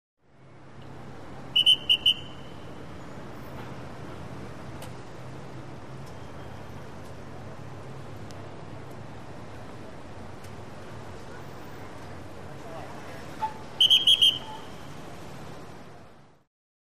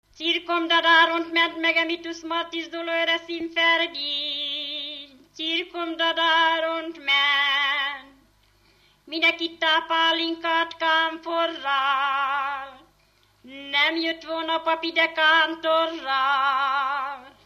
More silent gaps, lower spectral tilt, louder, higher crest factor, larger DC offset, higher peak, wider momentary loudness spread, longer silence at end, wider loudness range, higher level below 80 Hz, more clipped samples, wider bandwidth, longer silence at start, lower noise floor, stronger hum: neither; about the same, -2.5 dB/octave vs -1.5 dB/octave; about the same, -20 LUFS vs -22 LUFS; about the same, 22 dB vs 18 dB; first, 0.7% vs under 0.1%; about the same, -10 dBFS vs -8 dBFS; first, 24 LU vs 11 LU; first, 0.35 s vs 0.15 s; first, 19 LU vs 3 LU; first, -56 dBFS vs -68 dBFS; neither; about the same, 15.5 kHz vs 15 kHz; about the same, 0.15 s vs 0.2 s; second, -52 dBFS vs -62 dBFS; second, none vs 50 Hz at -70 dBFS